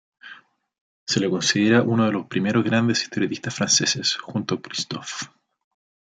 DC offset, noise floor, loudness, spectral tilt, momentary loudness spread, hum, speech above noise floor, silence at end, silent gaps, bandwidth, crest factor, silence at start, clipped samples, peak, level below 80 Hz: under 0.1%; -48 dBFS; -22 LUFS; -3.5 dB/octave; 12 LU; none; 26 dB; 0.85 s; 0.81-1.07 s; 9.4 kHz; 18 dB; 0.25 s; under 0.1%; -4 dBFS; -66 dBFS